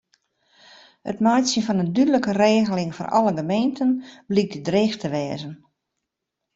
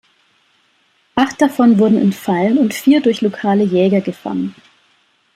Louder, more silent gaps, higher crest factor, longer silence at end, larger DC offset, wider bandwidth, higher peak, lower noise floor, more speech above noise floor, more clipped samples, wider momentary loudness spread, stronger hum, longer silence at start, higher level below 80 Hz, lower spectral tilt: second, -21 LUFS vs -15 LUFS; neither; about the same, 18 dB vs 14 dB; first, 1 s vs 0.85 s; neither; second, 8 kHz vs 15.5 kHz; second, -6 dBFS vs -2 dBFS; first, -82 dBFS vs -58 dBFS; first, 61 dB vs 45 dB; neither; about the same, 10 LU vs 11 LU; neither; about the same, 1.05 s vs 1.15 s; about the same, -62 dBFS vs -58 dBFS; about the same, -5.5 dB/octave vs -6.5 dB/octave